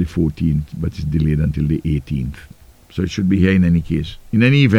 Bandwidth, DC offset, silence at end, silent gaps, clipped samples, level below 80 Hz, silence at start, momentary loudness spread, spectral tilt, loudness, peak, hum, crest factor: 10.5 kHz; under 0.1%; 0 s; none; under 0.1%; -30 dBFS; 0 s; 11 LU; -8 dB/octave; -18 LUFS; 0 dBFS; none; 16 dB